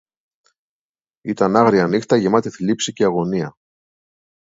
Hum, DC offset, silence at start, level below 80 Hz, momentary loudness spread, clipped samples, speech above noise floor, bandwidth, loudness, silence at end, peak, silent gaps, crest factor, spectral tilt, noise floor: none; under 0.1%; 1.25 s; -58 dBFS; 12 LU; under 0.1%; over 73 dB; 8 kHz; -18 LUFS; 1 s; 0 dBFS; none; 20 dB; -5.5 dB/octave; under -90 dBFS